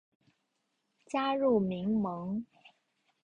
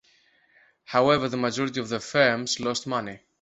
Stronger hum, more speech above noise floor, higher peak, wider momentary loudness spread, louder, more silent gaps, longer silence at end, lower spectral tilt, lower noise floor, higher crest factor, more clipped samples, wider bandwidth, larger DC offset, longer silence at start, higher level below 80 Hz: neither; first, 50 dB vs 38 dB; second, -16 dBFS vs -6 dBFS; about the same, 11 LU vs 9 LU; second, -32 LUFS vs -25 LUFS; neither; first, 0.55 s vs 0.25 s; first, -7.5 dB/octave vs -4 dB/octave; first, -80 dBFS vs -62 dBFS; about the same, 18 dB vs 22 dB; neither; first, 9.2 kHz vs 8.2 kHz; neither; first, 1.15 s vs 0.9 s; second, -68 dBFS vs -62 dBFS